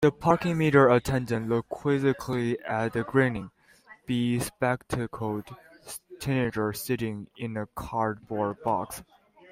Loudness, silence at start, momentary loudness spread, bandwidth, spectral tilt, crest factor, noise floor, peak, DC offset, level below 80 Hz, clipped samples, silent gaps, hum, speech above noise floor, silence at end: -27 LUFS; 0 s; 15 LU; 16 kHz; -6.5 dB/octave; 20 dB; -55 dBFS; -6 dBFS; under 0.1%; -54 dBFS; under 0.1%; none; none; 28 dB; 0.5 s